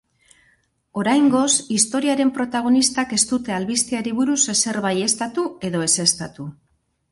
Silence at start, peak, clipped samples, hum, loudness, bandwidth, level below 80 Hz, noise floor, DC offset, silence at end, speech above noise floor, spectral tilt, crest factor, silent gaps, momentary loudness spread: 0.95 s; -2 dBFS; under 0.1%; none; -19 LUFS; 11.5 kHz; -58 dBFS; -62 dBFS; under 0.1%; 0.6 s; 42 dB; -2.5 dB/octave; 18 dB; none; 8 LU